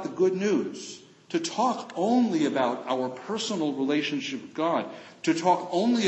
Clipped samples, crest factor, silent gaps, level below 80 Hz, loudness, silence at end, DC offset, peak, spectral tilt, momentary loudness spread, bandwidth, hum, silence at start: under 0.1%; 16 dB; none; -78 dBFS; -27 LUFS; 0 s; under 0.1%; -10 dBFS; -4.5 dB/octave; 9 LU; 8.4 kHz; none; 0 s